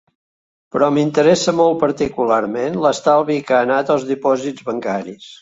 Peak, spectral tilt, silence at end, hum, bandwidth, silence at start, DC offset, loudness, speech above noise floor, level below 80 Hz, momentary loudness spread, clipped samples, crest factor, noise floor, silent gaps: -2 dBFS; -5 dB/octave; 0.1 s; none; 8 kHz; 0.75 s; under 0.1%; -17 LUFS; over 74 dB; -56 dBFS; 10 LU; under 0.1%; 16 dB; under -90 dBFS; none